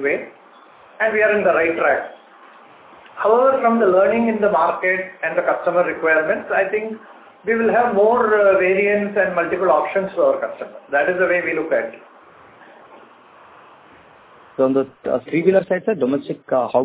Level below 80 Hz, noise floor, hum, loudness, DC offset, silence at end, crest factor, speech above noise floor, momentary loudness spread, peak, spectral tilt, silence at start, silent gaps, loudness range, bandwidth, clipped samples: -60 dBFS; -47 dBFS; none; -18 LUFS; under 0.1%; 0 s; 16 dB; 29 dB; 9 LU; -2 dBFS; -9.5 dB/octave; 0 s; none; 7 LU; 4 kHz; under 0.1%